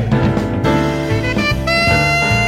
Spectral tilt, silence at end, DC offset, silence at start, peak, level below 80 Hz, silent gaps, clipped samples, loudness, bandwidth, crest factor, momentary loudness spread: -5.5 dB/octave; 0 s; under 0.1%; 0 s; -2 dBFS; -28 dBFS; none; under 0.1%; -15 LUFS; 16 kHz; 12 dB; 5 LU